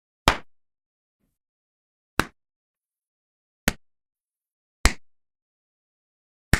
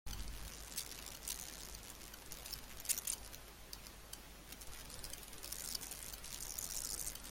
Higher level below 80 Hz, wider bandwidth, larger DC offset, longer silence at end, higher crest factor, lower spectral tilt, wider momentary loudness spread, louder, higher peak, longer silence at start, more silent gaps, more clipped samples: first, -38 dBFS vs -56 dBFS; about the same, 15.5 kHz vs 17 kHz; neither; about the same, 0 s vs 0 s; about the same, 30 dB vs 26 dB; first, -3.5 dB/octave vs -1 dB/octave; about the same, 11 LU vs 12 LU; first, -26 LUFS vs -45 LUFS; first, 0 dBFS vs -22 dBFS; first, 0.25 s vs 0.05 s; first, 0.86-1.20 s, 1.49-2.17 s, 2.56-2.75 s, 3.07-3.67 s, 4.53-4.84 s, 5.42-6.52 s vs none; neither